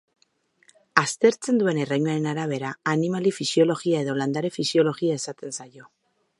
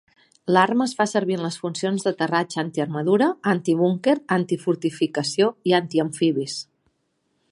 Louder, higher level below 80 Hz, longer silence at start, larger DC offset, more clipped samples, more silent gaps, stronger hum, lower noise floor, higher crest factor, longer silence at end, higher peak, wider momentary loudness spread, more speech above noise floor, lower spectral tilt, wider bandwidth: about the same, -24 LUFS vs -22 LUFS; about the same, -74 dBFS vs -72 dBFS; first, 0.95 s vs 0.45 s; neither; neither; neither; neither; second, -65 dBFS vs -71 dBFS; about the same, 24 dB vs 20 dB; second, 0.55 s vs 0.9 s; about the same, 0 dBFS vs -2 dBFS; about the same, 8 LU vs 7 LU; second, 42 dB vs 50 dB; about the same, -5 dB/octave vs -5.5 dB/octave; about the same, 11.5 kHz vs 11.5 kHz